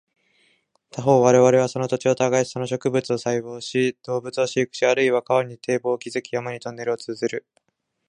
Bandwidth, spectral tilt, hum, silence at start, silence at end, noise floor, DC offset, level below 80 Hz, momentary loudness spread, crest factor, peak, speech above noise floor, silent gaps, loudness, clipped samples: 10.5 kHz; -5 dB/octave; none; 0.95 s; 0.7 s; -64 dBFS; under 0.1%; -66 dBFS; 12 LU; 20 dB; -2 dBFS; 43 dB; none; -22 LUFS; under 0.1%